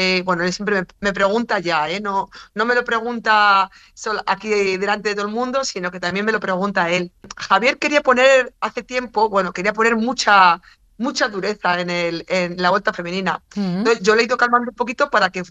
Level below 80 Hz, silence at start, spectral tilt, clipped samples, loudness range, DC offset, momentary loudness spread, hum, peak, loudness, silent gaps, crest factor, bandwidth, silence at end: -54 dBFS; 0 s; -4 dB/octave; under 0.1%; 4 LU; under 0.1%; 10 LU; none; 0 dBFS; -18 LUFS; none; 18 dB; 8.8 kHz; 0.05 s